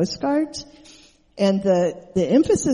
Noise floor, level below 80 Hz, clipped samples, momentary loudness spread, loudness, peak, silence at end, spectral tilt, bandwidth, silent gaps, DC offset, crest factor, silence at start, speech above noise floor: -50 dBFS; -50 dBFS; under 0.1%; 8 LU; -21 LUFS; -6 dBFS; 0 s; -5.5 dB/octave; 11.5 kHz; none; under 0.1%; 16 dB; 0 s; 30 dB